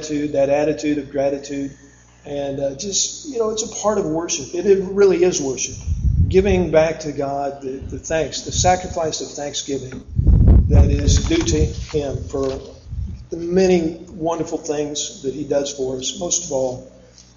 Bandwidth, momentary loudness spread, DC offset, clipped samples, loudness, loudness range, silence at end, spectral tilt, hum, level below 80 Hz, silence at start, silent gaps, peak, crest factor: 7.6 kHz; 12 LU; under 0.1%; under 0.1%; -20 LUFS; 5 LU; 0.5 s; -5 dB/octave; none; -24 dBFS; 0 s; none; 0 dBFS; 18 dB